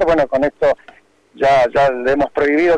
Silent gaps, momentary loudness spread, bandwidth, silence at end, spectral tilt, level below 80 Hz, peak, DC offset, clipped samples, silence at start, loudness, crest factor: none; 5 LU; 9.8 kHz; 0 s; -6 dB/octave; -42 dBFS; -8 dBFS; under 0.1%; under 0.1%; 0 s; -15 LUFS; 8 dB